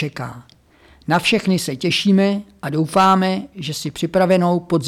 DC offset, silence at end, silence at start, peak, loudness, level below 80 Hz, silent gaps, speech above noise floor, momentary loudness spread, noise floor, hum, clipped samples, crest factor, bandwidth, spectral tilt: under 0.1%; 0 s; 0 s; -6 dBFS; -18 LUFS; -54 dBFS; none; 33 dB; 12 LU; -50 dBFS; none; under 0.1%; 12 dB; 15 kHz; -5.5 dB/octave